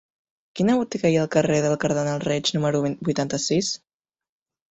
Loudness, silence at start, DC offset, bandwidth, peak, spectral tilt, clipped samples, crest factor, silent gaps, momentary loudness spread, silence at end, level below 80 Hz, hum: -23 LUFS; 0.55 s; under 0.1%; 8.4 kHz; -6 dBFS; -5 dB/octave; under 0.1%; 18 dB; none; 5 LU; 0.95 s; -58 dBFS; none